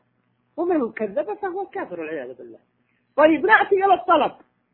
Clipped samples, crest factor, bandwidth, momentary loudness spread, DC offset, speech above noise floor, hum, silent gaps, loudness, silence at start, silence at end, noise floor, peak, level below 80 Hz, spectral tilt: under 0.1%; 20 dB; 4.2 kHz; 15 LU; under 0.1%; 47 dB; none; none; -20 LUFS; 0.55 s; 0.4 s; -68 dBFS; -2 dBFS; -64 dBFS; -8.5 dB/octave